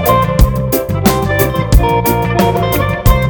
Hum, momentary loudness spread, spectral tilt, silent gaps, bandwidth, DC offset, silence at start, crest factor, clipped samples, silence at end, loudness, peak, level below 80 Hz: none; 3 LU; -6 dB/octave; none; over 20 kHz; under 0.1%; 0 s; 12 dB; under 0.1%; 0 s; -12 LUFS; 0 dBFS; -16 dBFS